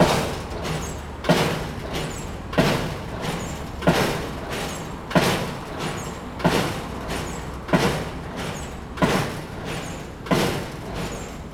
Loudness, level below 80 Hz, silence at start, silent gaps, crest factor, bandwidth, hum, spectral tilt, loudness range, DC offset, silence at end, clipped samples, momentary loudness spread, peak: -25 LUFS; -38 dBFS; 0 s; none; 22 dB; 18.5 kHz; none; -5 dB/octave; 2 LU; under 0.1%; 0 s; under 0.1%; 11 LU; -4 dBFS